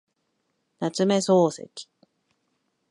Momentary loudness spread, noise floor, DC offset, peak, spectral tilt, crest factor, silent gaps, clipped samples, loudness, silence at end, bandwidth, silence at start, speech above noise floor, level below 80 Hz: 20 LU; -75 dBFS; under 0.1%; -8 dBFS; -5.5 dB/octave; 18 dB; none; under 0.1%; -23 LUFS; 1.05 s; 11.5 kHz; 0.8 s; 52 dB; -78 dBFS